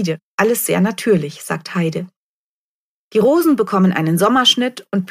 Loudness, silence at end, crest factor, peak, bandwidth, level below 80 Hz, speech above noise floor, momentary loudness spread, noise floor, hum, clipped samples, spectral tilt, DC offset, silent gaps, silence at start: -16 LUFS; 0.05 s; 16 dB; 0 dBFS; 15.5 kHz; -58 dBFS; over 74 dB; 11 LU; under -90 dBFS; none; under 0.1%; -4.5 dB/octave; under 0.1%; 0.23-0.38 s, 2.16-3.11 s; 0 s